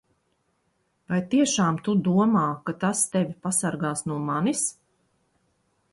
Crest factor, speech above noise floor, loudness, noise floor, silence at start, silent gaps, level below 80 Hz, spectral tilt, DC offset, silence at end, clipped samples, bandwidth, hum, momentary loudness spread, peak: 16 dB; 48 dB; -24 LUFS; -71 dBFS; 1.1 s; none; -66 dBFS; -5 dB/octave; under 0.1%; 1.2 s; under 0.1%; 11.5 kHz; none; 8 LU; -10 dBFS